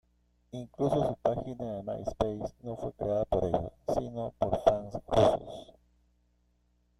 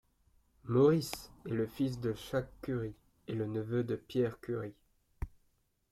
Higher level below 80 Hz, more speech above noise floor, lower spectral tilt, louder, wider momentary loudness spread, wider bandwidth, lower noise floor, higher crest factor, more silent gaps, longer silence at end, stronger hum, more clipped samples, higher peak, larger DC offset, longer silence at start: first, -50 dBFS vs -56 dBFS; about the same, 40 dB vs 41 dB; about the same, -7.5 dB/octave vs -7 dB/octave; first, -31 LUFS vs -35 LUFS; second, 13 LU vs 19 LU; second, 13 kHz vs 15.5 kHz; second, -71 dBFS vs -75 dBFS; about the same, 24 dB vs 20 dB; neither; first, 1.35 s vs 0.65 s; first, 60 Hz at -55 dBFS vs none; neither; first, -8 dBFS vs -16 dBFS; neither; about the same, 0.55 s vs 0.65 s